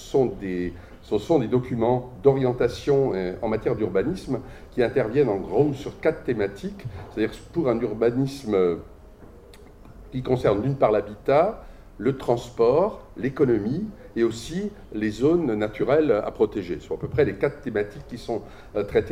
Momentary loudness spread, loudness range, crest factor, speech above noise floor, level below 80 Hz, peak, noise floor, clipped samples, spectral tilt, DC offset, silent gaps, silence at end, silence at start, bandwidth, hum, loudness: 11 LU; 3 LU; 18 dB; 23 dB; -46 dBFS; -6 dBFS; -46 dBFS; under 0.1%; -7.5 dB/octave; under 0.1%; none; 0 s; 0 s; 14.5 kHz; none; -24 LUFS